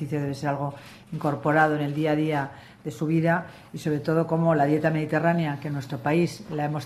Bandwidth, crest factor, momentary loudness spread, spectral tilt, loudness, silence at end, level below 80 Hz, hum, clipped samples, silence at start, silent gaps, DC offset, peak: 13.5 kHz; 16 dB; 12 LU; -7.5 dB/octave; -25 LUFS; 0 s; -62 dBFS; none; under 0.1%; 0 s; none; under 0.1%; -8 dBFS